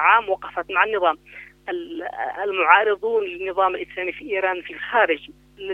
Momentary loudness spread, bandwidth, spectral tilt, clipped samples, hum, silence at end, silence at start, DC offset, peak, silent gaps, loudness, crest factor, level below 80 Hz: 15 LU; 5.4 kHz; -5 dB/octave; under 0.1%; 50 Hz at -60 dBFS; 0 s; 0 s; under 0.1%; 0 dBFS; none; -21 LUFS; 22 dB; -58 dBFS